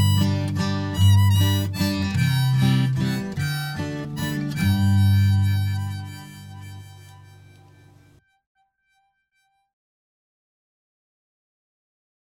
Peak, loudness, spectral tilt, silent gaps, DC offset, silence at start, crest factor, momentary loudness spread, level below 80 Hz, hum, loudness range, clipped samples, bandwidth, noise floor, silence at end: -8 dBFS; -21 LUFS; -6 dB/octave; none; under 0.1%; 0 s; 16 dB; 19 LU; -52 dBFS; none; 11 LU; under 0.1%; 17.5 kHz; -70 dBFS; 5.35 s